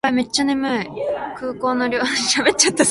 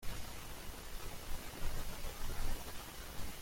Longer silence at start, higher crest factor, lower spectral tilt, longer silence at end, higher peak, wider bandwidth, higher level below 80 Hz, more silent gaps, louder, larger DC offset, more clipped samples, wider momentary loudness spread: about the same, 0.05 s vs 0 s; about the same, 18 dB vs 16 dB; second, -2 dB/octave vs -3.5 dB/octave; about the same, 0 s vs 0 s; first, -2 dBFS vs -24 dBFS; second, 11.5 kHz vs 16.5 kHz; second, -54 dBFS vs -44 dBFS; neither; first, -19 LUFS vs -47 LUFS; neither; neither; first, 10 LU vs 4 LU